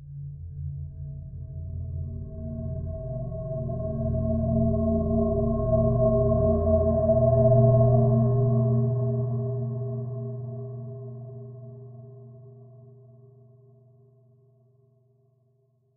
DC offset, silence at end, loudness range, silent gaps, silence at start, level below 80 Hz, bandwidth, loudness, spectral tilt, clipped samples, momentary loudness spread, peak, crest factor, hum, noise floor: under 0.1%; 2.85 s; 17 LU; none; 0 s; -40 dBFS; 1.7 kHz; -25 LUFS; -16.5 dB/octave; under 0.1%; 20 LU; -8 dBFS; 18 dB; none; -66 dBFS